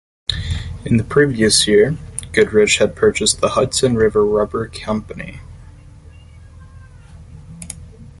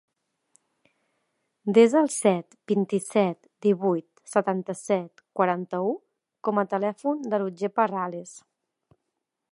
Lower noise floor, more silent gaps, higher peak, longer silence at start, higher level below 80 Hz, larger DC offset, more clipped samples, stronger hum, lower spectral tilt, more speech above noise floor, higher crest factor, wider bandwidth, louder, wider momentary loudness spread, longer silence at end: second, -40 dBFS vs -82 dBFS; neither; first, 0 dBFS vs -4 dBFS; second, 0.3 s vs 1.65 s; first, -36 dBFS vs -80 dBFS; neither; neither; neither; second, -4 dB/octave vs -6 dB/octave; second, 25 dB vs 58 dB; about the same, 18 dB vs 22 dB; about the same, 11.5 kHz vs 11.5 kHz; first, -16 LUFS vs -25 LUFS; first, 19 LU vs 11 LU; second, 0.15 s vs 1.15 s